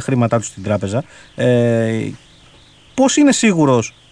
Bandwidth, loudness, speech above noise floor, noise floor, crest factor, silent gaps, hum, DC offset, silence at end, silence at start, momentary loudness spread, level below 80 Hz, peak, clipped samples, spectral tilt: 10.5 kHz; -16 LUFS; 31 dB; -46 dBFS; 14 dB; none; none; under 0.1%; 0.2 s; 0 s; 12 LU; -52 dBFS; -2 dBFS; under 0.1%; -5.5 dB/octave